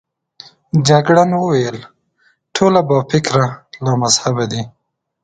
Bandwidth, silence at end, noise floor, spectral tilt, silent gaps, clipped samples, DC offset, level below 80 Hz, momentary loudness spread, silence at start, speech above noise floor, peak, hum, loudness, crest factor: 9.4 kHz; 0.55 s; -59 dBFS; -5 dB/octave; none; under 0.1%; under 0.1%; -52 dBFS; 12 LU; 0.75 s; 45 dB; 0 dBFS; none; -15 LUFS; 16 dB